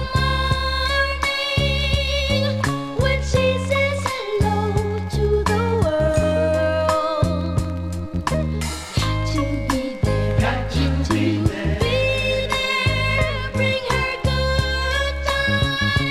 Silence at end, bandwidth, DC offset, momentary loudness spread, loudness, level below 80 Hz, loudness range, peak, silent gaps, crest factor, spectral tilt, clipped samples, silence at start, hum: 0 s; 15 kHz; under 0.1%; 4 LU; -20 LUFS; -28 dBFS; 2 LU; -6 dBFS; none; 14 dB; -5.5 dB/octave; under 0.1%; 0 s; none